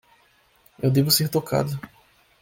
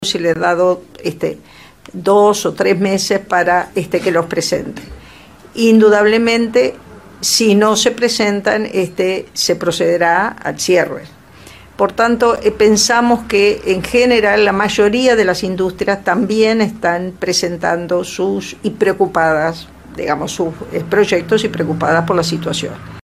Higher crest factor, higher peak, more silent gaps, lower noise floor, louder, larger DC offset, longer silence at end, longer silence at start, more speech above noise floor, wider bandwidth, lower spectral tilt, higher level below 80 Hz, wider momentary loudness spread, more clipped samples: first, 20 dB vs 14 dB; second, -6 dBFS vs 0 dBFS; neither; first, -60 dBFS vs -40 dBFS; second, -22 LUFS vs -14 LUFS; second, under 0.1% vs 0.2%; first, 0.55 s vs 0.05 s; first, 0.8 s vs 0 s; first, 39 dB vs 26 dB; about the same, 17 kHz vs 15.5 kHz; about the same, -5 dB/octave vs -4 dB/octave; second, -56 dBFS vs -44 dBFS; about the same, 11 LU vs 10 LU; neither